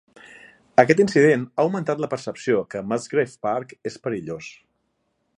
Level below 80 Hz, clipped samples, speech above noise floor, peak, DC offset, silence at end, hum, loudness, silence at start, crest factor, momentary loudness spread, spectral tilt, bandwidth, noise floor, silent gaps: -66 dBFS; under 0.1%; 50 dB; 0 dBFS; under 0.1%; 0.9 s; none; -22 LUFS; 0.8 s; 22 dB; 14 LU; -6 dB/octave; 10.5 kHz; -72 dBFS; none